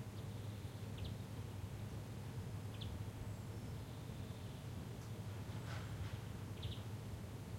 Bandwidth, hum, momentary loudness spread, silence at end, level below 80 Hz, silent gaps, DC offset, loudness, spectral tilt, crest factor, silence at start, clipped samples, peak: 16.5 kHz; none; 2 LU; 0 s; -60 dBFS; none; under 0.1%; -49 LUFS; -6 dB/octave; 14 dB; 0 s; under 0.1%; -34 dBFS